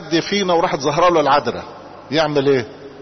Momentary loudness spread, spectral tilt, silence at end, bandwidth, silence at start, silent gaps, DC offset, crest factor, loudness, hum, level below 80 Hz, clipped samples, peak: 17 LU; -5 dB/octave; 0 s; 6.4 kHz; 0 s; none; under 0.1%; 12 dB; -17 LUFS; none; -50 dBFS; under 0.1%; -6 dBFS